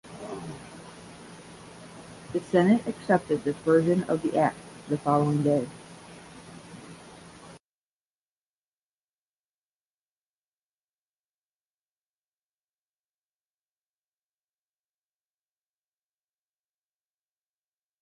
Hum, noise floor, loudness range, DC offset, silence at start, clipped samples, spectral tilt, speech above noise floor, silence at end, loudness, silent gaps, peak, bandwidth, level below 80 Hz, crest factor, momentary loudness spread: 50 Hz at -55 dBFS; under -90 dBFS; 8 LU; under 0.1%; 0.05 s; under 0.1%; -7 dB/octave; over 66 dB; 10.45 s; -25 LUFS; none; -8 dBFS; 11.5 kHz; -66 dBFS; 24 dB; 23 LU